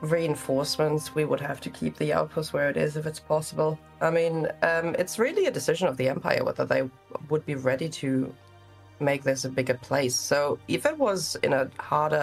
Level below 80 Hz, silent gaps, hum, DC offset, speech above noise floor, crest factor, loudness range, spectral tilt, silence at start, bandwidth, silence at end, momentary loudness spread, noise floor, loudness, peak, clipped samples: -62 dBFS; none; none; under 0.1%; 25 dB; 20 dB; 3 LU; -4.5 dB/octave; 0 s; 15.5 kHz; 0 s; 5 LU; -51 dBFS; -27 LUFS; -8 dBFS; under 0.1%